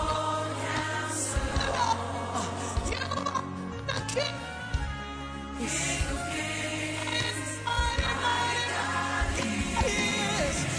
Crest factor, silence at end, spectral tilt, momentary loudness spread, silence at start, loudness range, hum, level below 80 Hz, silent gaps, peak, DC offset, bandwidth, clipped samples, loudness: 16 dB; 0 s; -3.5 dB/octave; 7 LU; 0 s; 4 LU; none; -40 dBFS; none; -14 dBFS; under 0.1%; 11 kHz; under 0.1%; -30 LUFS